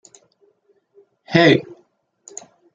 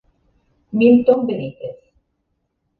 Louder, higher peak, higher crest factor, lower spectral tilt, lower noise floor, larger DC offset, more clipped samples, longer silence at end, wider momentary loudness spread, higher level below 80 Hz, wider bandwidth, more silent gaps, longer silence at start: about the same, -16 LUFS vs -16 LUFS; about the same, -2 dBFS vs -2 dBFS; about the same, 20 dB vs 18 dB; second, -5.5 dB/octave vs -10 dB/octave; second, -62 dBFS vs -71 dBFS; neither; neither; about the same, 1.15 s vs 1.05 s; first, 24 LU vs 20 LU; about the same, -60 dBFS vs -58 dBFS; first, 7.8 kHz vs 4.5 kHz; neither; first, 1.3 s vs 0.75 s